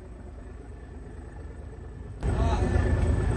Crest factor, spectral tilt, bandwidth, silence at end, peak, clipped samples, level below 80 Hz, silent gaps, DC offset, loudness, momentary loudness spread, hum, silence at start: 16 dB; -7.5 dB/octave; 9.2 kHz; 0 s; -14 dBFS; under 0.1%; -32 dBFS; none; under 0.1%; -27 LUFS; 18 LU; none; 0 s